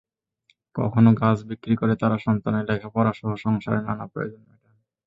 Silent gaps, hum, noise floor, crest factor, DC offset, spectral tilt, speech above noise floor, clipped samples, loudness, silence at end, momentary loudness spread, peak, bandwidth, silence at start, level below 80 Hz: none; none; -67 dBFS; 18 dB; under 0.1%; -9.5 dB/octave; 45 dB; under 0.1%; -23 LUFS; 0.7 s; 13 LU; -4 dBFS; 7.4 kHz; 0.75 s; -54 dBFS